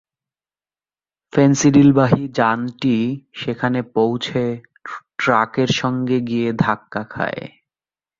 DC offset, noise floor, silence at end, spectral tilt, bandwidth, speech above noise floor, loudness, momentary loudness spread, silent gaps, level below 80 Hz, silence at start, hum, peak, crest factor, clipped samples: under 0.1%; under -90 dBFS; 0.7 s; -6 dB/octave; 7.6 kHz; over 73 dB; -18 LUFS; 15 LU; none; -54 dBFS; 1.35 s; none; -2 dBFS; 18 dB; under 0.1%